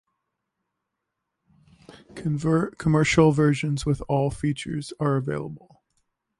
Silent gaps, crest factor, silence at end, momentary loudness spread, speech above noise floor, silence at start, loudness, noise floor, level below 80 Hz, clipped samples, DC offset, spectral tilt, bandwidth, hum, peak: none; 20 dB; 0.8 s; 14 LU; 59 dB; 1.9 s; -24 LUFS; -82 dBFS; -48 dBFS; under 0.1%; under 0.1%; -6.5 dB/octave; 11.5 kHz; none; -6 dBFS